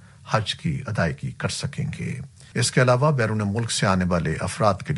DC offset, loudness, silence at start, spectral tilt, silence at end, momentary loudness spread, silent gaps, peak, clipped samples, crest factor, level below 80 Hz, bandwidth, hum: under 0.1%; -23 LUFS; 0.25 s; -5 dB/octave; 0 s; 10 LU; none; -4 dBFS; under 0.1%; 20 dB; -48 dBFS; 11.5 kHz; none